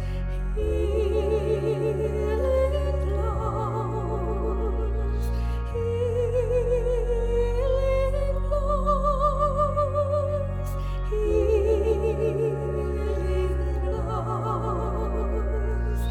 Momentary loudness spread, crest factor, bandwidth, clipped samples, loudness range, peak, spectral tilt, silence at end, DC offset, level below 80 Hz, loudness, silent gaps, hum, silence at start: 5 LU; 14 dB; 10.5 kHz; under 0.1%; 3 LU; -10 dBFS; -8 dB/octave; 0 s; under 0.1%; -28 dBFS; -26 LUFS; none; none; 0 s